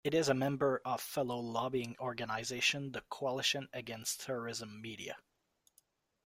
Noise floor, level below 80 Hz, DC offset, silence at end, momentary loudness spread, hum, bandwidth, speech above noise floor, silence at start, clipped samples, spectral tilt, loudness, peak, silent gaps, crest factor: -76 dBFS; -72 dBFS; under 0.1%; 1.05 s; 12 LU; none; 16 kHz; 39 dB; 0.05 s; under 0.1%; -3.5 dB/octave; -37 LUFS; -16 dBFS; none; 22 dB